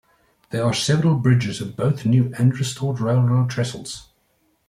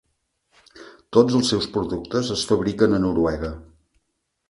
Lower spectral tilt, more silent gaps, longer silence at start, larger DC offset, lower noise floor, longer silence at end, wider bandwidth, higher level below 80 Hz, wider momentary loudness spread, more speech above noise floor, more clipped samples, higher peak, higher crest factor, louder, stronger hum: about the same, -6 dB/octave vs -5.5 dB/octave; neither; second, 0.5 s vs 0.75 s; neither; second, -65 dBFS vs -75 dBFS; second, 0.65 s vs 0.85 s; about the same, 12 kHz vs 11.5 kHz; second, -56 dBFS vs -44 dBFS; about the same, 10 LU vs 9 LU; second, 46 dB vs 55 dB; neither; second, -6 dBFS vs 0 dBFS; second, 16 dB vs 22 dB; about the same, -20 LUFS vs -21 LUFS; neither